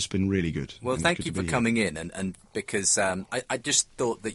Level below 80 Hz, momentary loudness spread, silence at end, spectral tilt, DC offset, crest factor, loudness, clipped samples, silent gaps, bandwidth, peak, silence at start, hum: -50 dBFS; 10 LU; 0 s; -3.5 dB/octave; under 0.1%; 22 dB; -27 LUFS; under 0.1%; none; 11.5 kHz; -6 dBFS; 0 s; none